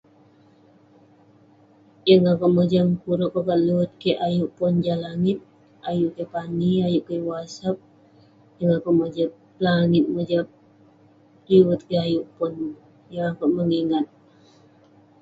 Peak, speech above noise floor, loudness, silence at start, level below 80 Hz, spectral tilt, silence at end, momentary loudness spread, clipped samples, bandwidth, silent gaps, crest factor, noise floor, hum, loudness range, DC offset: -2 dBFS; 34 dB; -22 LUFS; 2.05 s; -60 dBFS; -8 dB/octave; 1.15 s; 11 LU; under 0.1%; 7.6 kHz; none; 20 dB; -55 dBFS; none; 5 LU; under 0.1%